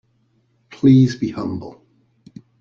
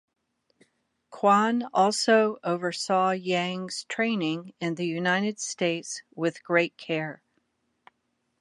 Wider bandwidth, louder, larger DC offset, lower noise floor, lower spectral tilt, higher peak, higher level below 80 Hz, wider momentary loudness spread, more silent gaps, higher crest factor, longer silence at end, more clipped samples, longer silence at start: second, 7 kHz vs 11.5 kHz; first, -17 LUFS vs -26 LUFS; neither; second, -62 dBFS vs -76 dBFS; first, -8.5 dB/octave vs -4 dB/octave; first, -2 dBFS vs -8 dBFS; first, -54 dBFS vs -80 dBFS; first, 18 LU vs 10 LU; neither; about the same, 18 dB vs 18 dB; second, 0.9 s vs 1.25 s; neither; second, 0.85 s vs 1.1 s